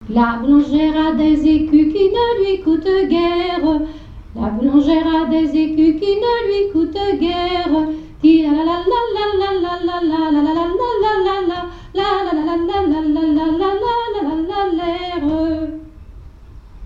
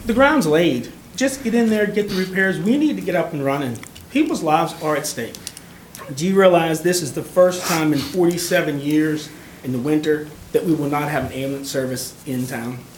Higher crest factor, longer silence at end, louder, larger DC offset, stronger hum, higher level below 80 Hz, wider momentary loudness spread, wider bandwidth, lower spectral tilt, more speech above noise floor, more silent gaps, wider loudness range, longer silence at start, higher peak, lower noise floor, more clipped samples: about the same, 14 dB vs 18 dB; about the same, 0 s vs 0 s; first, -16 LUFS vs -19 LUFS; neither; neither; first, -36 dBFS vs -50 dBFS; second, 7 LU vs 13 LU; second, 5.6 kHz vs 19 kHz; first, -7 dB/octave vs -5 dB/octave; about the same, 23 dB vs 21 dB; neither; about the same, 3 LU vs 4 LU; about the same, 0 s vs 0 s; about the same, -2 dBFS vs -2 dBFS; about the same, -38 dBFS vs -40 dBFS; neither